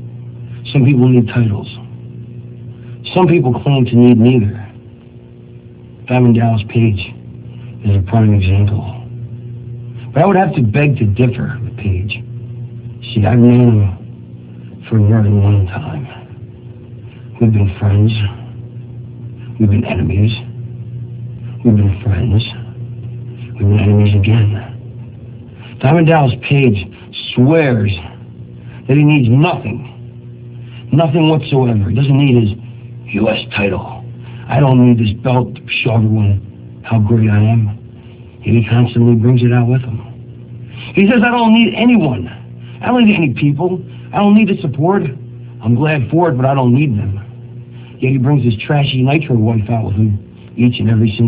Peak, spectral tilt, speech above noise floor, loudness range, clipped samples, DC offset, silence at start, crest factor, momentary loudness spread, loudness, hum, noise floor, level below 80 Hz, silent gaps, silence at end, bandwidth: 0 dBFS; -12 dB/octave; 25 dB; 4 LU; under 0.1%; under 0.1%; 0 s; 14 dB; 22 LU; -13 LUFS; 60 Hz at -30 dBFS; -36 dBFS; -34 dBFS; none; 0 s; 4 kHz